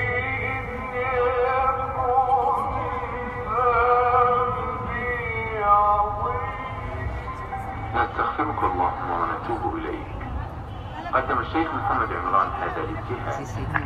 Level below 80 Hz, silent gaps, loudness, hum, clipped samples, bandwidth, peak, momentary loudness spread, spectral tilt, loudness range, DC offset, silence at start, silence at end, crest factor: -38 dBFS; none; -24 LUFS; none; under 0.1%; 12 kHz; -4 dBFS; 12 LU; -7 dB/octave; 5 LU; under 0.1%; 0 s; 0 s; 20 dB